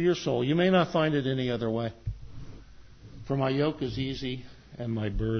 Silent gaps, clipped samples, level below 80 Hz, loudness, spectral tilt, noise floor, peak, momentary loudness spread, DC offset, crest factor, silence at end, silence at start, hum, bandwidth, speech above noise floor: none; under 0.1%; -46 dBFS; -28 LUFS; -7 dB/octave; -49 dBFS; -12 dBFS; 22 LU; under 0.1%; 16 dB; 0 s; 0 s; none; 6.6 kHz; 21 dB